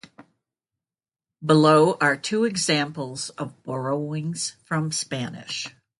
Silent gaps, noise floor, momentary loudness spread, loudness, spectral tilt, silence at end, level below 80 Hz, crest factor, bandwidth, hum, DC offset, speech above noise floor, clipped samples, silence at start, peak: none; under -90 dBFS; 14 LU; -23 LUFS; -4.5 dB/octave; 0.3 s; -68 dBFS; 20 dB; 11.5 kHz; none; under 0.1%; over 67 dB; under 0.1%; 0.2 s; -4 dBFS